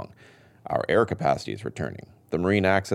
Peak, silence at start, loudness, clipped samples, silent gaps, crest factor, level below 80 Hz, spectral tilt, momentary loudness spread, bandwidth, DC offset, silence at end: -6 dBFS; 0 s; -26 LUFS; under 0.1%; none; 20 dB; -56 dBFS; -6.5 dB/octave; 19 LU; 13.5 kHz; under 0.1%; 0 s